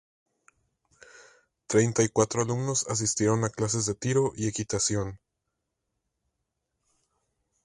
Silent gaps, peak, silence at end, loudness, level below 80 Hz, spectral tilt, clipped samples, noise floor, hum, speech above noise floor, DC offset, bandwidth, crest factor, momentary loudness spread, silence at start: none; -8 dBFS; 2.5 s; -27 LUFS; -58 dBFS; -4.5 dB/octave; under 0.1%; -82 dBFS; none; 56 dB; under 0.1%; 11.5 kHz; 22 dB; 5 LU; 1.15 s